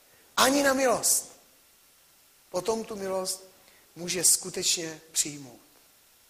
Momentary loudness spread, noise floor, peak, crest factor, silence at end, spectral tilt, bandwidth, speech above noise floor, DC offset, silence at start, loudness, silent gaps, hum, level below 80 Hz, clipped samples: 14 LU; -60 dBFS; -6 dBFS; 24 dB; 0.75 s; -1 dB/octave; 15.5 kHz; 33 dB; under 0.1%; 0.35 s; -26 LUFS; none; none; -66 dBFS; under 0.1%